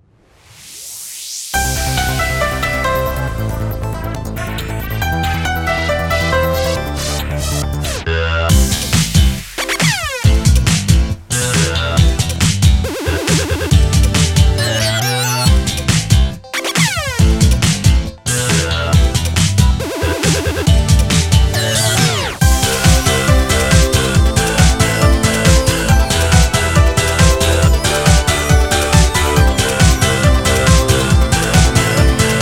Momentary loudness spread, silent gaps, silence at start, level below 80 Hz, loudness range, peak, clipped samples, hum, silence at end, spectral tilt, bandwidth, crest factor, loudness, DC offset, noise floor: 8 LU; none; 0.6 s; -18 dBFS; 6 LU; 0 dBFS; under 0.1%; none; 0 s; -4 dB/octave; 17 kHz; 12 dB; -14 LUFS; under 0.1%; -48 dBFS